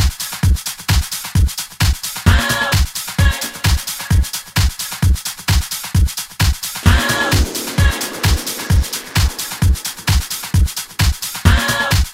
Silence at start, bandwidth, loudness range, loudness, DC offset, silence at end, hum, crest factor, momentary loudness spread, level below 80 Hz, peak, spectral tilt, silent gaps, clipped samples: 0 s; 16.5 kHz; 1 LU; -17 LUFS; 0.1%; 0 s; none; 16 dB; 5 LU; -20 dBFS; 0 dBFS; -3.5 dB/octave; none; under 0.1%